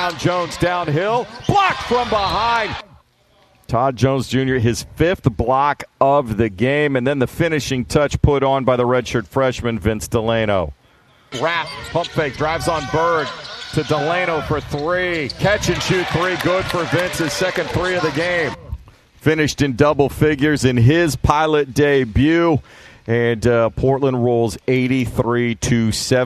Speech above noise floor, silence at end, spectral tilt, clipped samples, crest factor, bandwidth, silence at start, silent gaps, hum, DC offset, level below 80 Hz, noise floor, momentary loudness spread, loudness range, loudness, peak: 38 dB; 0 s; -5.5 dB/octave; under 0.1%; 18 dB; 14 kHz; 0 s; none; none; under 0.1%; -36 dBFS; -55 dBFS; 6 LU; 4 LU; -18 LUFS; 0 dBFS